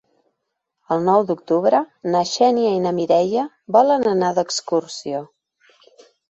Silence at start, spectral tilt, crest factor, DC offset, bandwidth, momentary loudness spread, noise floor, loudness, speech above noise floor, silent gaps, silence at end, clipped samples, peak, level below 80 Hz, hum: 0.9 s; -5 dB/octave; 18 dB; under 0.1%; 8.2 kHz; 8 LU; -77 dBFS; -19 LUFS; 59 dB; none; 1.05 s; under 0.1%; -2 dBFS; -68 dBFS; none